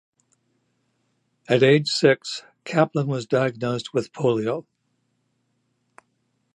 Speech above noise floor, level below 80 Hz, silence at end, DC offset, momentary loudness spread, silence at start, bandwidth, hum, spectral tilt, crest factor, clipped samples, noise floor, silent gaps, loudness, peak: 50 dB; -70 dBFS; 1.95 s; under 0.1%; 11 LU; 1.5 s; 11 kHz; none; -5.5 dB/octave; 22 dB; under 0.1%; -72 dBFS; none; -22 LUFS; -2 dBFS